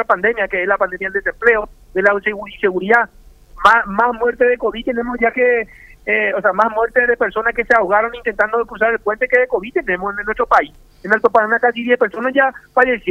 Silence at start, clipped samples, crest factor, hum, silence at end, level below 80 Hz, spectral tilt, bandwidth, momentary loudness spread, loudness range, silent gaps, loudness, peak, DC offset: 0 s; under 0.1%; 16 dB; none; 0 s; -44 dBFS; -5.5 dB/octave; 9 kHz; 7 LU; 1 LU; none; -16 LUFS; 0 dBFS; under 0.1%